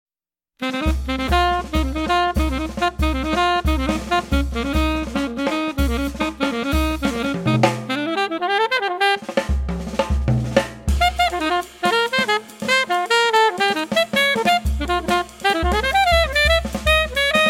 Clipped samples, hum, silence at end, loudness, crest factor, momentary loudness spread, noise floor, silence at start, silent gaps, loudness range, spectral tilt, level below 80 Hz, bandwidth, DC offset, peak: under 0.1%; none; 0 s; -19 LUFS; 18 dB; 7 LU; under -90 dBFS; 0.6 s; none; 4 LU; -4.5 dB/octave; -28 dBFS; 16.5 kHz; under 0.1%; -2 dBFS